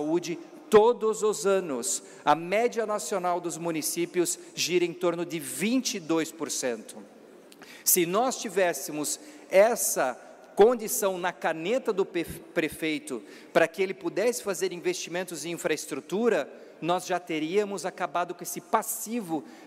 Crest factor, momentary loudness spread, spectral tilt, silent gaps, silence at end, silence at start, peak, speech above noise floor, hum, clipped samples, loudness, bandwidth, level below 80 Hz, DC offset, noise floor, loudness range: 18 dB; 11 LU; -3 dB/octave; none; 0 s; 0 s; -10 dBFS; 23 dB; none; under 0.1%; -27 LUFS; 16 kHz; -68 dBFS; under 0.1%; -50 dBFS; 4 LU